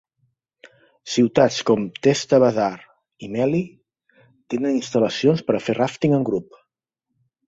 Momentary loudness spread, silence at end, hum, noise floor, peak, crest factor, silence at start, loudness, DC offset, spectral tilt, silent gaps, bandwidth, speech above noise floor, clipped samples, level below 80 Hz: 13 LU; 1.05 s; none; -80 dBFS; -2 dBFS; 20 dB; 1.05 s; -20 LUFS; under 0.1%; -6 dB/octave; none; 8 kHz; 60 dB; under 0.1%; -60 dBFS